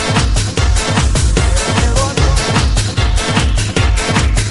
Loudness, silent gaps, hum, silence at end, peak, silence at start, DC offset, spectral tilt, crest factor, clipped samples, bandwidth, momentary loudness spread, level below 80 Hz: -14 LUFS; none; none; 0 s; 0 dBFS; 0 s; 0.4%; -4 dB/octave; 12 dB; under 0.1%; 11.5 kHz; 2 LU; -16 dBFS